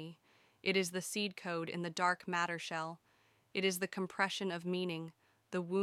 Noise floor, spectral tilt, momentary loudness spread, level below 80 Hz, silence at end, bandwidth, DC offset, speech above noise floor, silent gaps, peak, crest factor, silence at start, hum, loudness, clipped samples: -72 dBFS; -4 dB/octave; 9 LU; -84 dBFS; 0 s; 16 kHz; under 0.1%; 35 dB; none; -18 dBFS; 22 dB; 0 s; none; -37 LUFS; under 0.1%